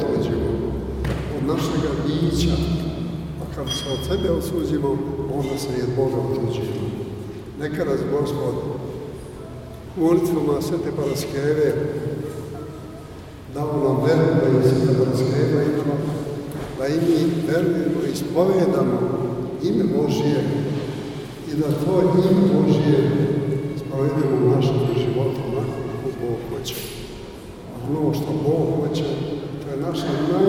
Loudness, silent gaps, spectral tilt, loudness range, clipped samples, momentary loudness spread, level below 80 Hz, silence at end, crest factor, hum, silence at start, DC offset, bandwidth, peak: -22 LUFS; none; -7 dB/octave; 5 LU; under 0.1%; 14 LU; -40 dBFS; 0 s; 18 dB; none; 0 s; under 0.1%; 16.5 kHz; -4 dBFS